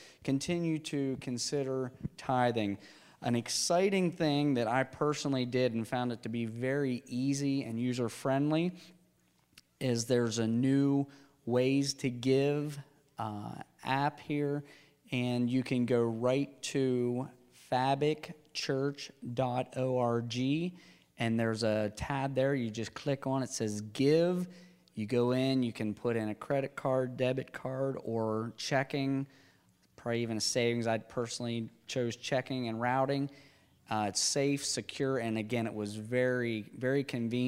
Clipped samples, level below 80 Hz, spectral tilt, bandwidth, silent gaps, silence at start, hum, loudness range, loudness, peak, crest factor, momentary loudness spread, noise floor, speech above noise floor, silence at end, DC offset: under 0.1%; -68 dBFS; -5 dB/octave; 15.5 kHz; none; 0 s; none; 3 LU; -33 LUFS; -14 dBFS; 18 dB; 9 LU; -70 dBFS; 38 dB; 0 s; under 0.1%